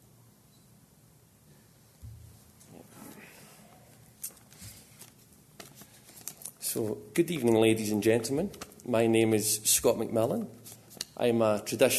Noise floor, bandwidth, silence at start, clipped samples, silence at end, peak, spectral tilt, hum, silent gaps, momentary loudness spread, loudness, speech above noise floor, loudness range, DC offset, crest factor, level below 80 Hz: -60 dBFS; 13.5 kHz; 2 s; under 0.1%; 0 s; -10 dBFS; -4 dB/octave; none; none; 25 LU; -28 LUFS; 33 dB; 22 LU; under 0.1%; 22 dB; -64 dBFS